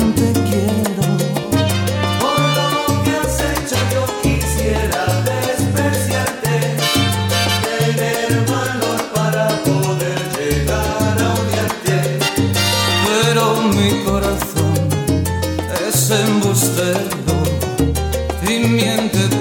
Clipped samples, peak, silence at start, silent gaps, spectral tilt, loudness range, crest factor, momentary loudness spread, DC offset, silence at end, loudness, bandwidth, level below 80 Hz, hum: under 0.1%; -2 dBFS; 0 s; none; -4.5 dB/octave; 2 LU; 14 dB; 4 LU; under 0.1%; 0 s; -16 LUFS; over 20 kHz; -30 dBFS; none